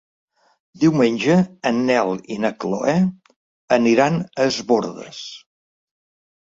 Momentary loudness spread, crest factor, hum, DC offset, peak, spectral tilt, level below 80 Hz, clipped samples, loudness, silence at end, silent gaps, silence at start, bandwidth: 12 LU; 18 dB; none; under 0.1%; -2 dBFS; -6 dB/octave; -62 dBFS; under 0.1%; -19 LUFS; 1.1 s; 3.36-3.68 s; 0.8 s; 7.8 kHz